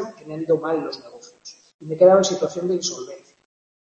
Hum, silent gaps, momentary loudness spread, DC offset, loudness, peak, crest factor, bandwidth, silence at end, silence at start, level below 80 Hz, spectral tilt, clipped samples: none; 1.74-1.79 s; 24 LU; under 0.1%; -20 LUFS; -2 dBFS; 20 dB; 8 kHz; 0.65 s; 0 s; -70 dBFS; -4.5 dB/octave; under 0.1%